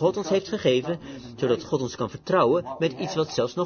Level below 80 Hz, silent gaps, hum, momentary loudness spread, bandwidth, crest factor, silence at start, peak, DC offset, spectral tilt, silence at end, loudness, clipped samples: -60 dBFS; none; none; 10 LU; 6.8 kHz; 18 dB; 0 s; -8 dBFS; under 0.1%; -5.5 dB/octave; 0 s; -25 LUFS; under 0.1%